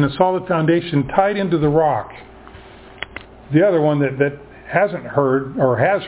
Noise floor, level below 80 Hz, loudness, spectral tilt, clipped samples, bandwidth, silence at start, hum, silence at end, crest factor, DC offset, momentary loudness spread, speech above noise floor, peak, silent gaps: -40 dBFS; -48 dBFS; -18 LUFS; -11 dB/octave; under 0.1%; 4 kHz; 0 s; none; 0 s; 18 dB; under 0.1%; 16 LU; 23 dB; 0 dBFS; none